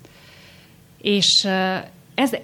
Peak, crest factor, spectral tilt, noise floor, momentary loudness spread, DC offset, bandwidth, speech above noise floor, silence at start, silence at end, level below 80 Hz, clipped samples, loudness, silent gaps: -6 dBFS; 18 dB; -3 dB/octave; -49 dBFS; 14 LU; under 0.1%; 18.5 kHz; 30 dB; 1.05 s; 0 s; -64 dBFS; under 0.1%; -19 LUFS; none